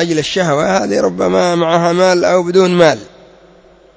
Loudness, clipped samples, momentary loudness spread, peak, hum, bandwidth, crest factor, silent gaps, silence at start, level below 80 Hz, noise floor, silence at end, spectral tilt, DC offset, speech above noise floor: -12 LUFS; under 0.1%; 4 LU; 0 dBFS; none; 8 kHz; 12 dB; none; 0 s; -50 dBFS; -44 dBFS; 0.9 s; -5 dB/octave; under 0.1%; 32 dB